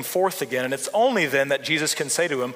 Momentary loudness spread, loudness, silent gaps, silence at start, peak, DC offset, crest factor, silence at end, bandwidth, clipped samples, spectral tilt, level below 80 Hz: 5 LU; -22 LUFS; none; 0 s; -8 dBFS; under 0.1%; 16 dB; 0 s; 16 kHz; under 0.1%; -2.5 dB/octave; -74 dBFS